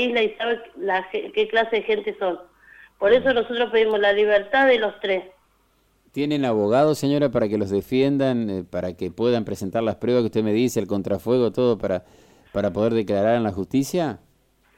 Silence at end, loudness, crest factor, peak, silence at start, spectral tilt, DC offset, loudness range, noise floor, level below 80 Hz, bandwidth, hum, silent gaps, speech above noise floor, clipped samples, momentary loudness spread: 0.6 s; -22 LUFS; 16 dB; -6 dBFS; 0 s; -6 dB/octave; under 0.1%; 3 LU; -63 dBFS; -56 dBFS; 16.5 kHz; none; none; 42 dB; under 0.1%; 9 LU